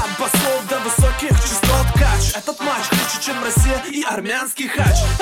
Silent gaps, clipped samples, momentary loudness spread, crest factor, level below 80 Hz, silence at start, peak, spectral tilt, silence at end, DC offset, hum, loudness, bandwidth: none; under 0.1%; 5 LU; 14 dB; -22 dBFS; 0 s; -2 dBFS; -4 dB/octave; 0 s; under 0.1%; none; -18 LUFS; 17 kHz